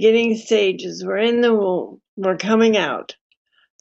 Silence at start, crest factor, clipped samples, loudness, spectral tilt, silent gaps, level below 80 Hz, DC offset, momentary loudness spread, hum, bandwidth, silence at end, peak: 0 s; 16 dB; under 0.1%; -19 LUFS; -5 dB/octave; 2.08-2.17 s; -74 dBFS; under 0.1%; 11 LU; none; 8 kHz; 0.7 s; -4 dBFS